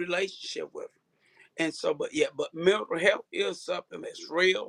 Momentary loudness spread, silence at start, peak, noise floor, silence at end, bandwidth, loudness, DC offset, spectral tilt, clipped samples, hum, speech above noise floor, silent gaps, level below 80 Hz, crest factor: 15 LU; 0 s; -8 dBFS; -67 dBFS; 0 s; 11 kHz; -29 LUFS; under 0.1%; -3.5 dB/octave; under 0.1%; none; 38 dB; none; -74 dBFS; 20 dB